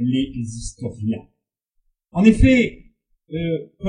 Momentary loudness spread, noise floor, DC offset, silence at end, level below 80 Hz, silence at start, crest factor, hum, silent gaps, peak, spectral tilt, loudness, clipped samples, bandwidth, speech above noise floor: 16 LU; -71 dBFS; under 0.1%; 0 s; -32 dBFS; 0 s; 20 dB; none; none; 0 dBFS; -6.5 dB/octave; -20 LUFS; under 0.1%; 10.5 kHz; 52 dB